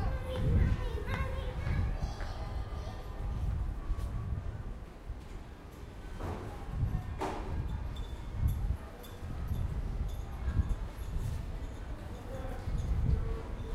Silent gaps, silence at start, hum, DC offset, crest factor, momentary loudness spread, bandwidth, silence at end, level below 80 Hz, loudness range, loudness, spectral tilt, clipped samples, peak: none; 0 s; none; under 0.1%; 16 dB; 12 LU; 14 kHz; 0 s; -38 dBFS; 5 LU; -38 LUFS; -7 dB/octave; under 0.1%; -18 dBFS